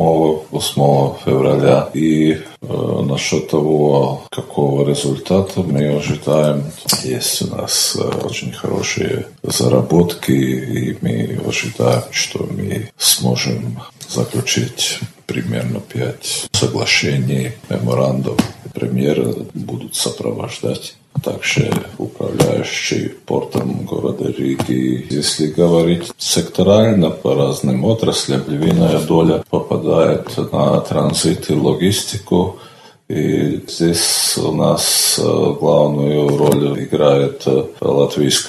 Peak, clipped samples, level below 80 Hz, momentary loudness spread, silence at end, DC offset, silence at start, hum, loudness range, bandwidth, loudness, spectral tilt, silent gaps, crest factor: 0 dBFS; under 0.1%; -44 dBFS; 9 LU; 0 s; under 0.1%; 0 s; none; 5 LU; 14 kHz; -16 LUFS; -4.5 dB/octave; none; 16 dB